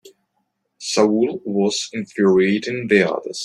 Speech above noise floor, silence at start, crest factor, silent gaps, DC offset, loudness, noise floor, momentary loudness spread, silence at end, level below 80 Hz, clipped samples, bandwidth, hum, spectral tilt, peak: 53 dB; 0.05 s; 18 dB; none; under 0.1%; -19 LUFS; -72 dBFS; 8 LU; 0 s; -62 dBFS; under 0.1%; 11.5 kHz; none; -4.5 dB/octave; -2 dBFS